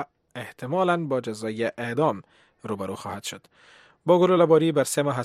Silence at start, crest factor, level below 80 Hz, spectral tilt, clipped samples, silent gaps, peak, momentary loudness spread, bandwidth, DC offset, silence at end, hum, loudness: 0 s; 20 dB; -70 dBFS; -5.5 dB/octave; under 0.1%; none; -6 dBFS; 19 LU; 15 kHz; under 0.1%; 0 s; none; -24 LUFS